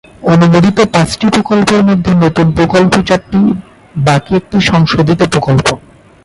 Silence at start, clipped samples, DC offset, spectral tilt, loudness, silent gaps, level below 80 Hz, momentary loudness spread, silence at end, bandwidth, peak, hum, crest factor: 0.2 s; under 0.1%; under 0.1%; -6 dB/octave; -10 LUFS; none; -34 dBFS; 5 LU; 0.45 s; 11.5 kHz; 0 dBFS; none; 10 dB